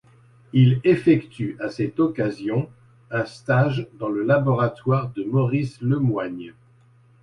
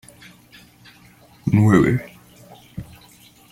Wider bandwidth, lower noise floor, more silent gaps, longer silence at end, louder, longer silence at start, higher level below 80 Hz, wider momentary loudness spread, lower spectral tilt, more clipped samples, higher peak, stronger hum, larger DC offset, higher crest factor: second, 9.2 kHz vs 15.5 kHz; first, -55 dBFS vs -50 dBFS; neither; about the same, 0.7 s vs 0.7 s; second, -22 LUFS vs -18 LUFS; second, 0.55 s vs 1.45 s; second, -56 dBFS vs -48 dBFS; second, 11 LU vs 26 LU; about the same, -9 dB/octave vs -8 dB/octave; neither; second, -6 dBFS vs -2 dBFS; second, none vs 60 Hz at -40 dBFS; neither; about the same, 16 dB vs 20 dB